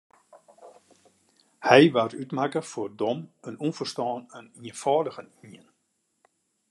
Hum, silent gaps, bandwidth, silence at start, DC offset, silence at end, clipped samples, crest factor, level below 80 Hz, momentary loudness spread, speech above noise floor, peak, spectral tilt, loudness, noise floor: none; none; 12 kHz; 0.65 s; under 0.1%; 1.15 s; under 0.1%; 26 dB; -78 dBFS; 24 LU; 50 dB; -2 dBFS; -5.5 dB/octave; -25 LUFS; -75 dBFS